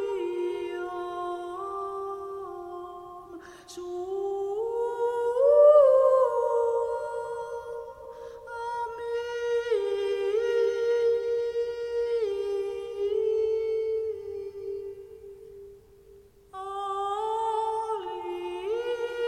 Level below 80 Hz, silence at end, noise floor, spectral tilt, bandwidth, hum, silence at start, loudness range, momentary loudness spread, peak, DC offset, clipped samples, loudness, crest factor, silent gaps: -64 dBFS; 0 s; -54 dBFS; -4.5 dB/octave; 11.5 kHz; none; 0 s; 13 LU; 18 LU; -8 dBFS; under 0.1%; under 0.1%; -27 LUFS; 18 dB; none